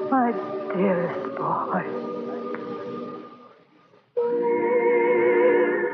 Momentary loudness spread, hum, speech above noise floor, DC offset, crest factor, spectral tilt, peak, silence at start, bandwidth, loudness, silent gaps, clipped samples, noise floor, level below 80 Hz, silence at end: 14 LU; none; 33 dB; under 0.1%; 16 dB; -9.5 dB/octave; -8 dBFS; 0 s; 5.2 kHz; -24 LUFS; none; under 0.1%; -57 dBFS; -78 dBFS; 0 s